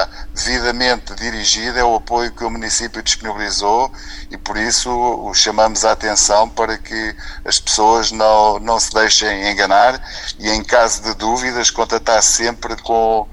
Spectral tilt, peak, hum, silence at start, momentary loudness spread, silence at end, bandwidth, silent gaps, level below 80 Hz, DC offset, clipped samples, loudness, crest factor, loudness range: -1 dB/octave; 0 dBFS; none; 0 s; 11 LU; 0 s; 14.5 kHz; none; -32 dBFS; under 0.1%; under 0.1%; -15 LUFS; 16 dB; 4 LU